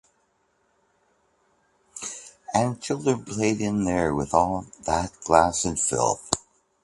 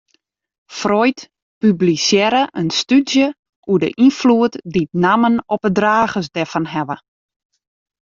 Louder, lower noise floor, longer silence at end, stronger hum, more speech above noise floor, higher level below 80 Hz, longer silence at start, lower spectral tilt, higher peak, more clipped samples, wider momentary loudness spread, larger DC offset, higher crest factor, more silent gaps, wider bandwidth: second, -25 LUFS vs -16 LUFS; first, -69 dBFS vs -64 dBFS; second, 0.45 s vs 1.1 s; neither; second, 45 dB vs 49 dB; first, -48 dBFS vs -56 dBFS; first, 1.95 s vs 0.7 s; about the same, -4.5 dB/octave vs -5 dB/octave; about the same, 0 dBFS vs -2 dBFS; neither; first, 14 LU vs 9 LU; neither; first, 26 dB vs 16 dB; second, none vs 1.42-1.61 s, 3.39-3.43 s, 3.49-3.63 s; first, 11.5 kHz vs 7.6 kHz